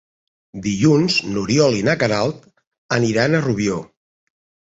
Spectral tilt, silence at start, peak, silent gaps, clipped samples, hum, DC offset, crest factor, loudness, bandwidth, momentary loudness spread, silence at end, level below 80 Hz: -5.5 dB/octave; 0.55 s; -2 dBFS; 2.67-2.71 s, 2.78-2.89 s; under 0.1%; none; under 0.1%; 18 dB; -18 LUFS; 8 kHz; 11 LU; 0.85 s; -52 dBFS